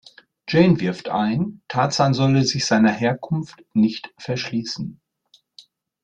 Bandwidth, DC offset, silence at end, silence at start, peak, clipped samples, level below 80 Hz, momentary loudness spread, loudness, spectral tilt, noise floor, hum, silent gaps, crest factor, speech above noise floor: 9 kHz; under 0.1%; 1.1 s; 0.45 s; -4 dBFS; under 0.1%; -56 dBFS; 11 LU; -20 LUFS; -5.5 dB/octave; -60 dBFS; none; none; 18 dB; 40 dB